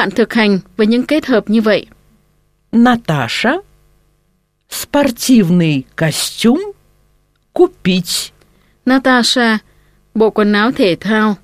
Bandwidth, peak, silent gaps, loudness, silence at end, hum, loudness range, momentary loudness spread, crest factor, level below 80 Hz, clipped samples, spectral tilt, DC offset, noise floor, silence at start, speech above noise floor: 15.5 kHz; 0 dBFS; none; -13 LUFS; 0.1 s; 50 Hz at -45 dBFS; 3 LU; 8 LU; 14 dB; -48 dBFS; under 0.1%; -5 dB/octave; under 0.1%; -61 dBFS; 0 s; 48 dB